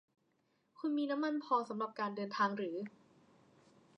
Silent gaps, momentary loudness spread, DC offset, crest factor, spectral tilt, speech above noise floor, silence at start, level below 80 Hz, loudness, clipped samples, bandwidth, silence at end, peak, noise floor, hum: none; 7 LU; under 0.1%; 18 dB; -6 dB/octave; 41 dB; 0.8 s; under -90 dBFS; -38 LUFS; under 0.1%; 8.4 kHz; 1.1 s; -22 dBFS; -78 dBFS; none